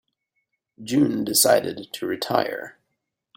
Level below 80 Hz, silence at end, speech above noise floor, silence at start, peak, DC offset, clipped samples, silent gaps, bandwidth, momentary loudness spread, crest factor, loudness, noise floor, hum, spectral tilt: -64 dBFS; 0.65 s; 56 dB; 0.8 s; -4 dBFS; under 0.1%; under 0.1%; none; 16.5 kHz; 17 LU; 22 dB; -22 LUFS; -79 dBFS; none; -3 dB/octave